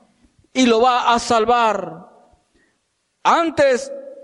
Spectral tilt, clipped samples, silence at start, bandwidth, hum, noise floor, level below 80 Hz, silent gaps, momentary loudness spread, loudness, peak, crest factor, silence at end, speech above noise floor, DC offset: -3.5 dB/octave; under 0.1%; 0.55 s; 11.5 kHz; none; -69 dBFS; -54 dBFS; none; 11 LU; -17 LUFS; -4 dBFS; 14 dB; 0.05 s; 53 dB; under 0.1%